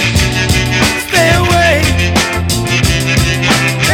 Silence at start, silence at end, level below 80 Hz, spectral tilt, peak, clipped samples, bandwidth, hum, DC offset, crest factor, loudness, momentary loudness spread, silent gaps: 0 s; 0 s; -22 dBFS; -4 dB/octave; 0 dBFS; under 0.1%; over 20 kHz; none; under 0.1%; 12 dB; -11 LUFS; 3 LU; none